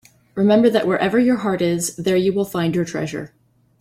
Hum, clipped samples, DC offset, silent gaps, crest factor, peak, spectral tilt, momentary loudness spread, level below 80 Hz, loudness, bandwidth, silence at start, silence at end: none; under 0.1%; under 0.1%; none; 16 dB; -2 dBFS; -5.5 dB/octave; 13 LU; -56 dBFS; -19 LUFS; 16 kHz; 0.35 s; 0.55 s